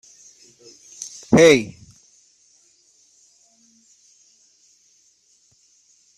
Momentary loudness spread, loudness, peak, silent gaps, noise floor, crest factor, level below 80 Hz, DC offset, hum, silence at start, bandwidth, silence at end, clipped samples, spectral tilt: 23 LU; -15 LUFS; -2 dBFS; none; -60 dBFS; 24 dB; -58 dBFS; under 0.1%; none; 1 s; 13.5 kHz; 4.5 s; under 0.1%; -4.5 dB/octave